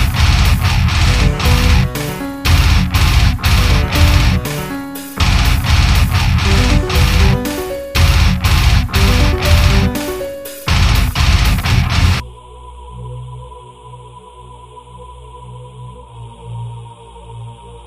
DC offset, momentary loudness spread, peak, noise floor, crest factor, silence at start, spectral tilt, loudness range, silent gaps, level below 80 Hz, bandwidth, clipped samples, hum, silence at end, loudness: under 0.1%; 21 LU; 0 dBFS; -36 dBFS; 14 dB; 0 s; -5 dB/octave; 20 LU; none; -16 dBFS; 15.5 kHz; under 0.1%; 60 Hz at -40 dBFS; 0.05 s; -13 LUFS